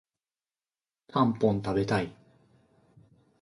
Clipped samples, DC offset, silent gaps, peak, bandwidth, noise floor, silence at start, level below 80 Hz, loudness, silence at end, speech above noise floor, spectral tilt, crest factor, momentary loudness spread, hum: under 0.1%; under 0.1%; none; -10 dBFS; 11.5 kHz; under -90 dBFS; 1.15 s; -58 dBFS; -28 LUFS; 1.3 s; over 63 dB; -7.5 dB/octave; 20 dB; 8 LU; none